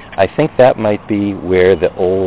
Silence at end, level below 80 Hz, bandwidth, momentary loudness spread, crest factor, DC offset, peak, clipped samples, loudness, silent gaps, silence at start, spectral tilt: 0 s; -38 dBFS; 4 kHz; 6 LU; 12 dB; under 0.1%; 0 dBFS; under 0.1%; -13 LUFS; none; 0 s; -11 dB/octave